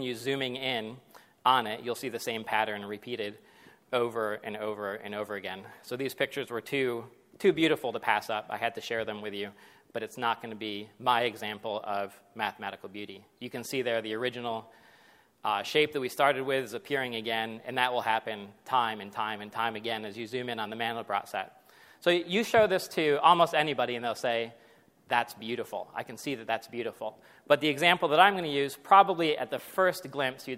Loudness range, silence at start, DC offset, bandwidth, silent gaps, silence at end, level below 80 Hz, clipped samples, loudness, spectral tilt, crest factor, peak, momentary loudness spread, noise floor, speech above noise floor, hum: 9 LU; 0 s; under 0.1%; 16 kHz; none; 0 s; -74 dBFS; under 0.1%; -30 LUFS; -4 dB/octave; 24 dB; -6 dBFS; 14 LU; -61 dBFS; 31 dB; none